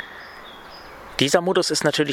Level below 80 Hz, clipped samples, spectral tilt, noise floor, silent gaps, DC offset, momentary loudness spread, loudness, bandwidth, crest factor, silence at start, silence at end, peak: -56 dBFS; under 0.1%; -3.5 dB/octave; -41 dBFS; none; under 0.1%; 21 LU; -20 LUFS; 17 kHz; 22 dB; 0 s; 0 s; -2 dBFS